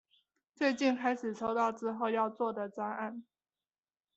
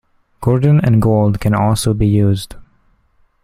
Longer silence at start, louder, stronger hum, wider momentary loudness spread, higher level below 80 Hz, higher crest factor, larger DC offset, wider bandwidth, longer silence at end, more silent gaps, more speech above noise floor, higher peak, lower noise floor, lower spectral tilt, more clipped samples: first, 0.6 s vs 0.4 s; second, -34 LUFS vs -14 LUFS; neither; about the same, 8 LU vs 8 LU; second, -78 dBFS vs -34 dBFS; about the same, 18 dB vs 14 dB; neither; second, 8.2 kHz vs 14.5 kHz; about the same, 0.95 s vs 0.85 s; neither; first, over 57 dB vs 43 dB; second, -18 dBFS vs 0 dBFS; first, under -90 dBFS vs -56 dBFS; second, -5 dB/octave vs -7.5 dB/octave; neither